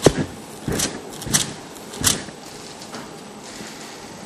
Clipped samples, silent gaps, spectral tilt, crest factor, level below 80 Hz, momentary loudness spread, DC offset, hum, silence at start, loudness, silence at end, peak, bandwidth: under 0.1%; none; -3 dB/octave; 26 dB; -44 dBFS; 16 LU; under 0.1%; none; 0 s; -24 LUFS; 0 s; 0 dBFS; 15 kHz